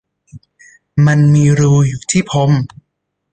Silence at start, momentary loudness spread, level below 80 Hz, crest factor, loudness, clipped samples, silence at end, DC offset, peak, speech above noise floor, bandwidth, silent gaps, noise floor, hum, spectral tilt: 0.35 s; 7 LU; -44 dBFS; 12 dB; -12 LUFS; under 0.1%; 0.65 s; under 0.1%; -2 dBFS; 60 dB; 9.2 kHz; none; -71 dBFS; none; -6.5 dB/octave